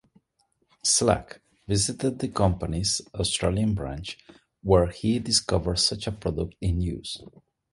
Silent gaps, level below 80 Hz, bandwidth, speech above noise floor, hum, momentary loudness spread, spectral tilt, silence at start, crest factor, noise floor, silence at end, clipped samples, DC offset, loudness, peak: none; -40 dBFS; 11.5 kHz; 46 dB; none; 14 LU; -4 dB/octave; 0.85 s; 22 dB; -71 dBFS; 0.45 s; under 0.1%; under 0.1%; -25 LUFS; -4 dBFS